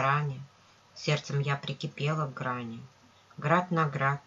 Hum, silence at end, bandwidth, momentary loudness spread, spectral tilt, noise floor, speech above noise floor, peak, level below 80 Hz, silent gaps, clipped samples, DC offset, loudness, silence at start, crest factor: none; 0.05 s; 7.6 kHz; 16 LU; -6 dB/octave; -57 dBFS; 27 dB; -10 dBFS; -70 dBFS; none; under 0.1%; under 0.1%; -30 LUFS; 0 s; 22 dB